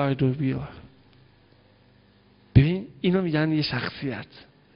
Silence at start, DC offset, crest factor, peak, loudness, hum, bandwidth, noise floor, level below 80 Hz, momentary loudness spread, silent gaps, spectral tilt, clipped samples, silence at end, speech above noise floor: 0 s; under 0.1%; 24 dB; -2 dBFS; -25 LUFS; 50 Hz at -50 dBFS; 5.6 kHz; -58 dBFS; -44 dBFS; 14 LU; none; -10.5 dB/octave; under 0.1%; 0.35 s; 32 dB